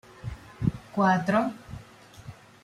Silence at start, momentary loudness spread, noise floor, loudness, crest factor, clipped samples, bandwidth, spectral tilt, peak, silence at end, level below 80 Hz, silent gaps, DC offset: 0.2 s; 23 LU; -49 dBFS; -26 LUFS; 18 dB; under 0.1%; 12.5 kHz; -7.5 dB/octave; -10 dBFS; 0.3 s; -50 dBFS; none; under 0.1%